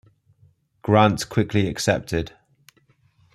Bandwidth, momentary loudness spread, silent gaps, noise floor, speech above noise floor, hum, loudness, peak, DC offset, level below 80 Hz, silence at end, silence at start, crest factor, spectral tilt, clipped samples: 14 kHz; 12 LU; none; -61 dBFS; 41 dB; none; -21 LUFS; -2 dBFS; under 0.1%; -48 dBFS; 1.05 s; 0.85 s; 22 dB; -5.5 dB/octave; under 0.1%